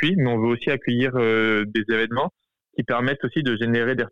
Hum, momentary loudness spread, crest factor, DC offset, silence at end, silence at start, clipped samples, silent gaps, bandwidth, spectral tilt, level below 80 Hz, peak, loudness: none; 6 LU; 12 dB; 0.6%; 0 s; 0 s; under 0.1%; none; 7.2 kHz; -8 dB/octave; -60 dBFS; -10 dBFS; -22 LUFS